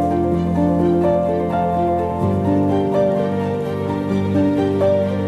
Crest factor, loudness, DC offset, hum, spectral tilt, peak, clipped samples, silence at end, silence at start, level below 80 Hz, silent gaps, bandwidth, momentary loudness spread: 12 dB; -18 LUFS; under 0.1%; none; -9 dB/octave; -4 dBFS; under 0.1%; 0 s; 0 s; -42 dBFS; none; 12.5 kHz; 4 LU